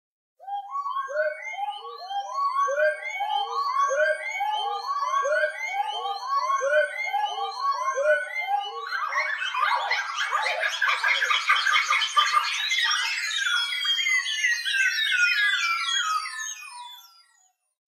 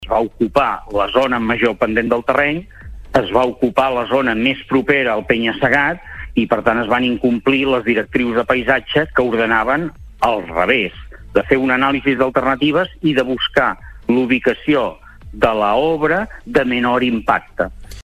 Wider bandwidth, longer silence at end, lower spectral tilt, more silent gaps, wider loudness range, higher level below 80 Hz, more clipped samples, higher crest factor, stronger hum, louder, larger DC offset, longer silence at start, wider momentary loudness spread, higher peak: first, 16 kHz vs 13.5 kHz; first, 0.85 s vs 0 s; second, 6.5 dB/octave vs -6.5 dB/octave; neither; first, 4 LU vs 1 LU; second, under -90 dBFS vs -38 dBFS; neither; about the same, 18 dB vs 16 dB; neither; second, -24 LUFS vs -16 LUFS; neither; first, 0.4 s vs 0 s; first, 10 LU vs 5 LU; second, -8 dBFS vs 0 dBFS